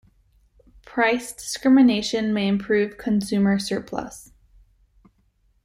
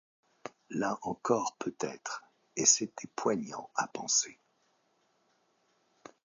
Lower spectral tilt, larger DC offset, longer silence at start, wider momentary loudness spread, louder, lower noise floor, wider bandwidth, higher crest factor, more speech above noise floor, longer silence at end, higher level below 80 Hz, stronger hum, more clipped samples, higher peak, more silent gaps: first, -5 dB/octave vs -2 dB/octave; neither; first, 0.95 s vs 0.45 s; about the same, 16 LU vs 17 LU; first, -22 LUFS vs -32 LUFS; second, -64 dBFS vs -73 dBFS; first, 15 kHz vs 9 kHz; second, 16 dB vs 26 dB; about the same, 43 dB vs 41 dB; second, 1.4 s vs 1.9 s; first, -54 dBFS vs -76 dBFS; neither; neither; first, -6 dBFS vs -10 dBFS; neither